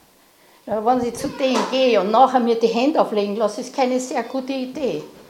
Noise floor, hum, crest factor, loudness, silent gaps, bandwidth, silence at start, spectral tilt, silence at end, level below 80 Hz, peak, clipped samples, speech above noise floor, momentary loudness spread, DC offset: -53 dBFS; none; 18 dB; -20 LUFS; none; 16 kHz; 0.65 s; -4.5 dB/octave; 0.1 s; -58 dBFS; -2 dBFS; under 0.1%; 34 dB; 10 LU; under 0.1%